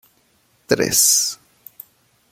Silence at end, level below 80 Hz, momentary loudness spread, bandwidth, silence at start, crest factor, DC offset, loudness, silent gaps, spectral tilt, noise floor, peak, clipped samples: 0.95 s; -56 dBFS; 12 LU; 16.5 kHz; 0.7 s; 20 dB; under 0.1%; -15 LUFS; none; -1 dB/octave; -61 dBFS; -2 dBFS; under 0.1%